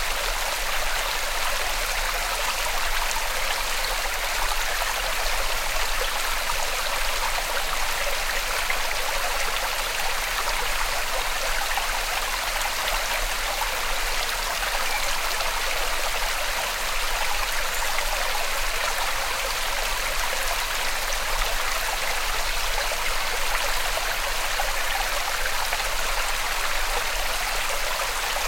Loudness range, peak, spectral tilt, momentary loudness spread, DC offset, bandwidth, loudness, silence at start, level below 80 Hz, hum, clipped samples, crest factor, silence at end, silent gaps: 0 LU; -8 dBFS; 0 dB/octave; 1 LU; under 0.1%; 16.5 kHz; -25 LUFS; 0 s; -32 dBFS; none; under 0.1%; 18 dB; 0 s; none